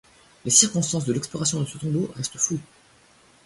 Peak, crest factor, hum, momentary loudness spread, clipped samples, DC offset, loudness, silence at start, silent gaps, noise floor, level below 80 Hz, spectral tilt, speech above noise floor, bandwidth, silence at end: -2 dBFS; 24 dB; none; 12 LU; under 0.1%; under 0.1%; -22 LUFS; 0.45 s; none; -56 dBFS; -60 dBFS; -3.5 dB/octave; 32 dB; 11.5 kHz; 0.8 s